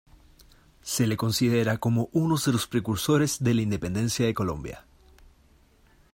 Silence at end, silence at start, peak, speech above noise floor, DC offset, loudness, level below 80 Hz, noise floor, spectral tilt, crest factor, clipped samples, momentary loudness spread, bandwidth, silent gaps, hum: 1.35 s; 0.85 s; -12 dBFS; 34 dB; under 0.1%; -26 LUFS; -52 dBFS; -59 dBFS; -5.5 dB/octave; 16 dB; under 0.1%; 8 LU; 16.5 kHz; none; none